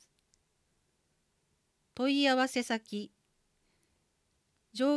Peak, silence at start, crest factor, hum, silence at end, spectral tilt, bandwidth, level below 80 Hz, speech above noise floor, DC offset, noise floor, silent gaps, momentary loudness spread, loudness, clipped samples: -18 dBFS; 2 s; 18 dB; none; 0 s; -3.5 dB/octave; 11 kHz; -80 dBFS; 46 dB; under 0.1%; -77 dBFS; none; 20 LU; -30 LUFS; under 0.1%